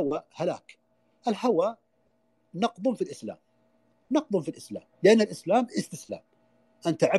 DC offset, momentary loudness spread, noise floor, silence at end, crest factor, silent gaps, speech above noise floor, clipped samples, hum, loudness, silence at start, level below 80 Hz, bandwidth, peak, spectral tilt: under 0.1%; 19 LU; -70 dBFS; 0 s; 20 dB; none; 44 dB; under 0.1%; none; -27 LUFS; 0 s; -76 dBFS; 12.5 kHz; -8 dBFS; -5.5 dB/octave